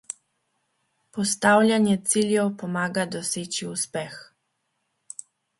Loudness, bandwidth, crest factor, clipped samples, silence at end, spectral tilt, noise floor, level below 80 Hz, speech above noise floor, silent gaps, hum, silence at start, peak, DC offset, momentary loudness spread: -23 LUFS; 12 kHz; 22 dB; under 0.1%; 1.35 s; -4 dB/octave; -76 dBFS; -68 dBFS; 52 dB; none; none; 0.1 s; -4 dBFS; under 0.1%; 22 LU